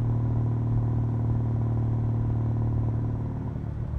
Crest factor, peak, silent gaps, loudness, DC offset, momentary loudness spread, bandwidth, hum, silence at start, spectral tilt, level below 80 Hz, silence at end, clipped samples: 12 dB; -14 dBFS; none; -27 LUFS; under 0.1%; 5 LU; 2.4 kHz; none; 0 s; -11.5 dB/octave; -36 dBFS; 0 s; under 0.1%